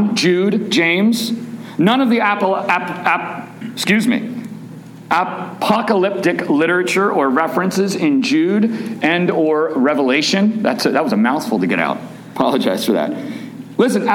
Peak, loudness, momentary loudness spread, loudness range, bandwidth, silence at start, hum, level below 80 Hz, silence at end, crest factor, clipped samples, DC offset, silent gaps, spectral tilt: 0 dBFS; -16 LUFS; 12 LU; 3 LU; 17.5 kHz; 0 s; none; -64 dBFS; 0 s; 16 dB; under 0.1%; under 0.1%; none; -5 dB/octave